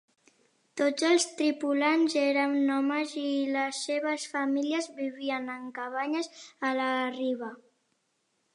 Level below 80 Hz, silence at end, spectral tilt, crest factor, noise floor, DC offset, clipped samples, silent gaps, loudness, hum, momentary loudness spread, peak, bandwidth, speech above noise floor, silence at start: -86 dBFS; 1 s; -2 dB/octave; 16 dB; -76 dBFS; under 0.1%; under 0.1%; none; -29 LUFS; none; 10 LU; -12 dBFS; 11 kHz; 47 dB; 0.75 s